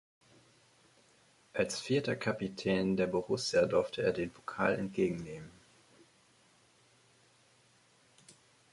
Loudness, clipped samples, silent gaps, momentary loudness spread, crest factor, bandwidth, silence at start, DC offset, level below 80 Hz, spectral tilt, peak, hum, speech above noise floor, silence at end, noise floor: -33 LUFS; under 0.1%; none; 12 LU; 22 dB; 11.5 kHz; 1.55 s; under 0.1%; -66 dBFS; -5 dB/octave; -16 dBFS; none; 34 dB; 0.4 s; -67 dBFS